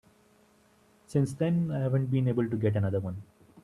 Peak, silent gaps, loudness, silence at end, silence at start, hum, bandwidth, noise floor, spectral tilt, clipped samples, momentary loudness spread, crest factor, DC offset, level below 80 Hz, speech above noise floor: -14 dBFS; none; -29 LUFS; 0.05 s; 1.1 s; none; 11.5 kHz; -63 dBFS; -9 dB/octave; under 0.1%; 6 LU; 16 dB; under 0.1%; -64 dBFS; 35 dB